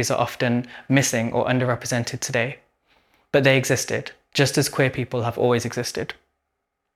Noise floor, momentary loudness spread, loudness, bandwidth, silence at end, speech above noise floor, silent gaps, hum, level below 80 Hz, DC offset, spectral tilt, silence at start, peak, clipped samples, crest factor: -78 dBFS; 9 LU; -22 LUFS; 15 kHz; 0.85 s; 56 dB; none; none; -58 dBFS; under 0.1%; -4.5 dB/octave; 0 s; -2 dBFS; under 0.1%; 20 dB